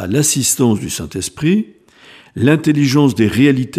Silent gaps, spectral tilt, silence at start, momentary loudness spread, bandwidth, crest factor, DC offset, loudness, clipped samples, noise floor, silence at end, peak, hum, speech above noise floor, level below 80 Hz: none; -5 dB/octave; 0 s; 10 LU; 15.5 kHz; 14 dB; under 0.1%; -14 LUFS; under 0.1%; -43 dBFS; 0 s; 0 dBFS; none; 30 dB; -48 dBFS